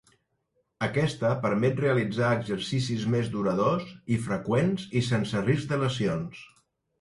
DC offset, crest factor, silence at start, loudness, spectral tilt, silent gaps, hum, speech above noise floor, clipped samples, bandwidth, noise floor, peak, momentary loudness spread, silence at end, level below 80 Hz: under 0.1%; 18 dB; 0.8 s; -27 LUFS; -6.5 dB/octave; none; none; 48 dB; under 0.1%; 11.5 kHz; -74 dBFS; -10 dBFS; 5 LU; 0.55 s; -58 dBFS